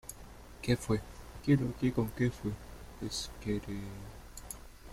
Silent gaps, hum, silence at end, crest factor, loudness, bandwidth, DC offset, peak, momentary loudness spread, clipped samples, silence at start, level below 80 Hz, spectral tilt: none; none; 0 s; 20 dB; -35 LUFS; 16.5 kHz; under 0.1%; -14 dBFS; 19 LU; under 0.1%; 0.05 s; -50 dBFS; -6 dB/octave